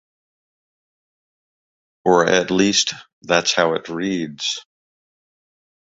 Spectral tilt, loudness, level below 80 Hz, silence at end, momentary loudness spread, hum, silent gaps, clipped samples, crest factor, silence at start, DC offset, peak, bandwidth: -3 dB/octave; -18 LUFS; -60 dBFS; 1.35 s; 9 LU; none; 3.13-3.22 s; under 0.1%; 22 dB; 2.05 s; under 0.1%; -2 dBFS; 8 kHz